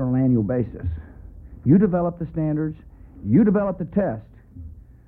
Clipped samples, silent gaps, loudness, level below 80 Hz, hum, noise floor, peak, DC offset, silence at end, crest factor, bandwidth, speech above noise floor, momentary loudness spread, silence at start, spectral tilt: under 0.1%; none; -22 LUFS; -44 dBFS; none; -41 dBFS; -6 dBFS; under 0.1%; 0.3 s; 16 dB; 2.9 kHz; 20 dB; 24 LU; 0 s; -13.5 dB/octave